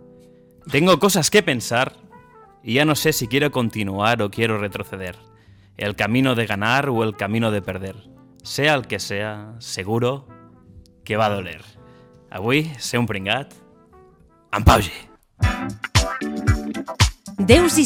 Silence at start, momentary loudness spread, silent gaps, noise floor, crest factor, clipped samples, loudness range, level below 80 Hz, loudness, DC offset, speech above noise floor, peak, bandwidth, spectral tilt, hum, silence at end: 0.65 s; 14 LU; none; -52 dBFS; 20 dB; under 0.1%; 6 LU; -34 dBFS; -20 LUFS; under 0.1%; 32 dB; 0 dBFS; 18 kHz; -4.5 dB/octave; none; 0 s